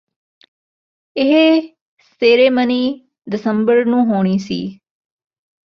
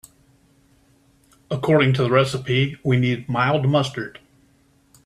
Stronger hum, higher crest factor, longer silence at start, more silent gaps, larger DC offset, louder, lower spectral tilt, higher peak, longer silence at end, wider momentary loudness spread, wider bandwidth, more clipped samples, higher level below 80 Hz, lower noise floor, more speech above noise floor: neither; about the same, 16 dB vs 18 dB; second, 1.15 s vs 1.5 s; first, 1.81-1.97 s vs none; neither; first, -15 LUFS vs -20 LUFS; about the same, -7 dB/octave vs -6.5 dB/octave; about the same, -2 dBFS vs -4 dBFS; about the same, 1.05 s vs 0.95 s; first, 14 LU vs 11 LU; second, 7 kHz vs 11.5 kHz; neither; second, -62 dBFS vs -56 dBFS; first, under -90 dBFS vs -59 dBFS; first, over 76 dB vs 39 dB